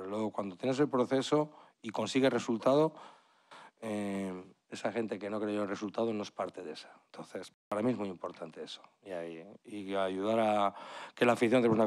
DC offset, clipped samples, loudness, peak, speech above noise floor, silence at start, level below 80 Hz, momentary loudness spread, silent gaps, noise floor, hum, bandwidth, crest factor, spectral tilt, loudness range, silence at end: under 0.1%; under 0.1%; -33 LUFS; -14 dBFS; 24 dB; 0 s; -82 dBFS; 17 LU; 7.54-7.71 s; -57 dBFS; none; 13 kHz; 18 dB; -5.5 dB/octave; 8 LU; 0 s